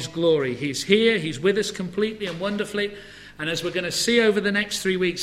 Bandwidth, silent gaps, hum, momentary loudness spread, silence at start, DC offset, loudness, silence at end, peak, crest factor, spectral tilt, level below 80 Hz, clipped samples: 16 kHz; none; 50 Hz at -55 dBFS; 9 LU; 0 s; under 0.1%; -23 LUFS; 0 s; -4 dBFS; 20 dB; -4 dB/octave; -56 dBFS; under 0.1%